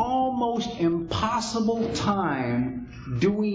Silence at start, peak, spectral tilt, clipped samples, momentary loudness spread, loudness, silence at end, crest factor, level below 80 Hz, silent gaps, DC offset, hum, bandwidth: 0 s; -10 dBFS; -6 dB/octave; under 0.1%; 4 LU; -26 LUFS; 0 s; 16 dB; -46 dBFS; none; under 0.1%; none; 7.8 kHz